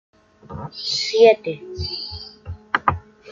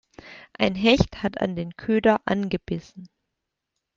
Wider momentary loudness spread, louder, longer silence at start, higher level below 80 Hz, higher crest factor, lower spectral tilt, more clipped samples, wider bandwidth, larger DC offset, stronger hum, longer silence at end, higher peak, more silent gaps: first, 21 LU vs 17 LU; first, -20 LUFS vs -23 LUFS; first, 0.5 s vs 0.25 s; about the same, -48 dBFS vs -46 dBFS; about the same, 20 dB vs 22 dB; second, -4 dB/octave vs -6 dB/octave; neither; about the same, 7.6 kHz vs 7.6 kHz; neither; neither; second, 0 s vs 0.9 s; about the same, -2 dBFS vs -2 dBFS; neither